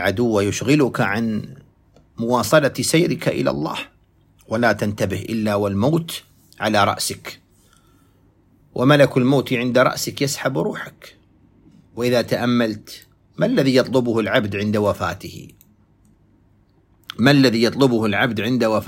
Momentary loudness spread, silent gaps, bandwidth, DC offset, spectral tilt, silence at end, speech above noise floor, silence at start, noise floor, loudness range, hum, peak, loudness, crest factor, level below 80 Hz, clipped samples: 16 LU; none; 16.5 kHz; under 0.1%; -5 dB/octave; 0 s; 38 dB; 0 s; -56 dBFS; 4 LU; none; 0 dBFS; -19 LUFS; 20 dB; -54 dBFS; under 0.1%